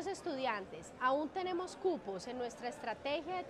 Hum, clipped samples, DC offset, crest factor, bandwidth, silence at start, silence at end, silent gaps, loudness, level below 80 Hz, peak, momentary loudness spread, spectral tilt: none; under 0.1%; under 0.1%; 18 dB; 12.5 kHz; 0 s; 0 s; none; -39 LUFS; -70 dBFS; -22 dBFS; 8 LU; -4 dB/octave